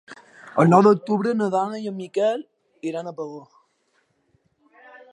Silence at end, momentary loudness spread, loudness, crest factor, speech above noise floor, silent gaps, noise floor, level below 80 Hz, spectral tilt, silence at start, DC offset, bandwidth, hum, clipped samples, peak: 0.15 s; 19 LU; -21 LUFS; 22 dB; 47 dB; none; -68 dBFS; -74 dBFS; -7.5 dB/octave; 0.1 s; under 0.1%; 10.5 kHz; none; under 0.1%; -2 dBFS